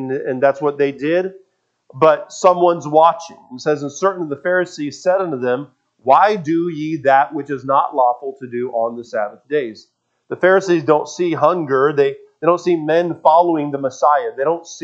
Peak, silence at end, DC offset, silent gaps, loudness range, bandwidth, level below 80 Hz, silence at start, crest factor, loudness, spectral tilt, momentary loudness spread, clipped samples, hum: 0 dBFS; 0.05 s; under 0.1%; none; 3 LU; 8 kHz; -70 dBFS; 0 s; 16 dB; -17 LUFS; -5.5 dB/octave; 10 LU; under 0.1%; none